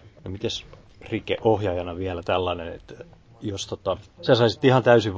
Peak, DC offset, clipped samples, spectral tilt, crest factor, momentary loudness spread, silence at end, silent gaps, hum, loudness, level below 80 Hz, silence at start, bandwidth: -4 dBFS; under 0.1%; under 0.1%; -6 dB/octave; 20 dB; 18 LU; 0 s; none; none; -24 LUFS; -46 dBFS; 0.25 s; 8 kHz